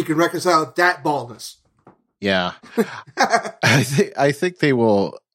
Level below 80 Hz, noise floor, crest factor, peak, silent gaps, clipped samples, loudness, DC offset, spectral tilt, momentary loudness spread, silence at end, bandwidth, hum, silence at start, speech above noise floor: -62 dBFS; -54 dBFS; 18 dB; -2 dBFS; none; under 0.1%; -19 LUFS; under 0.1%; -5 dB/octave; 10 LU; 0.15 s; 16.5 kHz; none; 0 s; 35 dB